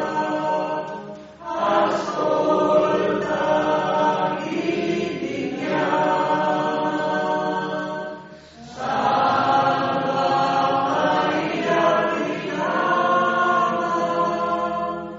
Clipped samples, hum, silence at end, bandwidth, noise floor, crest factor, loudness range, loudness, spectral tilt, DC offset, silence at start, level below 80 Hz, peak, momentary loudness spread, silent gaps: under 0.1%; none; 0 s; 7.8 kHz; -41 dBFS; 16 dB; 3 LU; -21 LUFS; -3.5 dB/octave; under 0.1%; 0 s; -58 dBFS; -6 dBFS; 8 LU; none